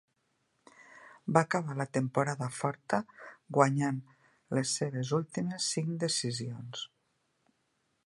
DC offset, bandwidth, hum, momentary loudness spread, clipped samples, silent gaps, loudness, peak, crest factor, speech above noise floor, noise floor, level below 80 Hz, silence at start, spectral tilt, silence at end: under 0.1%; 11.5 kHz; none; 13 LU; under 0.1%; none; -32 LUFS; -8 dBFS; 26 dB; 46 dB; -77 dBFS; -74 dBFS; 0.8 s; -4.5 dB/octave; 1.2 s